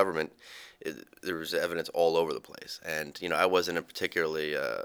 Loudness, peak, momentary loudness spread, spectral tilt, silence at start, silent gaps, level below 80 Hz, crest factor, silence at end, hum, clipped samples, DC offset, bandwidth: -31 LUFS; -8 dBFS; 15 LU; -3.5 dB/octave; 0 s; none; -68 dBFS; 22 dB; 0 s; none; under 0.1%; under 0.1%; over 20 kHz